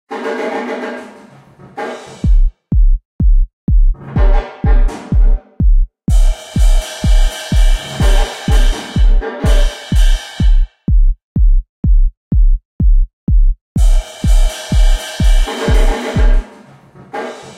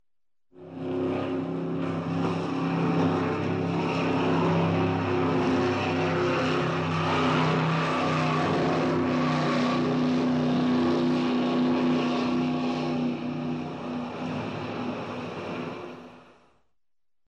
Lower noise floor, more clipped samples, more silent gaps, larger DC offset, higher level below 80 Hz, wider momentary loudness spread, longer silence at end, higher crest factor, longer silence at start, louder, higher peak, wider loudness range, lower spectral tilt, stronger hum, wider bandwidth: second, -40 dBFS vs under -90 dBFS; neither; first, 3.05-3.19 s, 3.53-3.67 s, 11.23-11.35 s, 11.69-11.83 s, 12.17-12.31 s, 12.65-12.79 s, 13.13-13.27 s, 13.61-13.75 s vs none; neither; first, -12 dBFS vs -62 dBFS; second, 6 LU vs 9 LU; second, 0.05 s vs 1.05 s; about the same, 10 dB vs 14 dB; second, 0.1 s vs 0.55 s; first, -16 LUFS vs -26 LUFS; first, 0 dBFS vs -12 dBFS; second, 2 LU vs 7 LU; second, -5.5 dB/octave vs -7 dB/octave; neither; first, 11.5 kHz vs 8.6 kHz